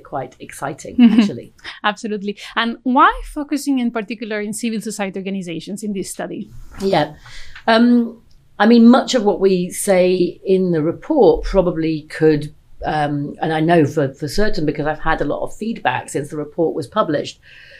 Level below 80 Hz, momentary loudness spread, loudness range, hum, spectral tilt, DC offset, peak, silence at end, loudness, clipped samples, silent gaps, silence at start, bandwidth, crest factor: -36 dBFS; 14 LU; 8 LU; none; -5.5 dB/octave; under 0.1%; 0 dBFS; 0.45 s; -17 LUFS; under 0.1%; none; 0.1 s; 14 kHz; 16 dB